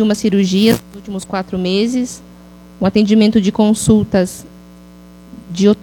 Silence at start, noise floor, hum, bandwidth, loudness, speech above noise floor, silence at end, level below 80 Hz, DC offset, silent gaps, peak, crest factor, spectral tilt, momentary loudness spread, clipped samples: 0 s; -39 dBFS; 60 Hz at -40 dBFS; 18 kHz; -14 LUFS; 26 dB; 0.05 s; -42 dBFS; under 0.1%; none; 0 dBFS; 14 dB; -5.5 dB/octave; 15 LU; under 0.1%